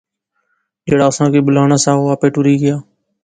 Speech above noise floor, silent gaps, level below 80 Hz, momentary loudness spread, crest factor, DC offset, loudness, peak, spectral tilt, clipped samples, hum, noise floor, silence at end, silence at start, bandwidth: 55 dB; none; -50 dBFS; 6 LU; 14 dB; under 0.1%; -13 LUFS; 0 dBFS; -6 dB/octave; under 0.1%; none; -67 dBFS; 0.4 s; 0.85 s; 9.4 kHz